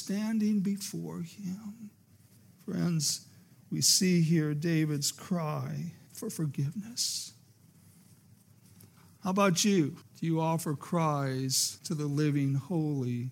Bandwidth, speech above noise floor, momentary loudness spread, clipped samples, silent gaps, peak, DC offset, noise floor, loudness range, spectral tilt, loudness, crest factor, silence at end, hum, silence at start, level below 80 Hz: 17 kHz; 29 dB; 14 LU; under 0.1%; none; -12 dBFS; under 0.1%; -60 dBFS; 8 LU; -4.5 dB/octave; -30 LUFS; 20 dB; 0 s; none; 0 s; -80 dBFS